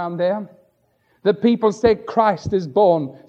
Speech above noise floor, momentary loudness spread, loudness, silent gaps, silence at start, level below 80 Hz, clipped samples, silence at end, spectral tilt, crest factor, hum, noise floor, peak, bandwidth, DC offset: 45 dB; 7 LU; -19 LUFS; none; 0 s; -50 dBFS; under 0.1%; 0.1 s; -7 dB/octave; 16 dB; none; -63 dBFS; -2 dBFS; 8 kHz; under 0.1%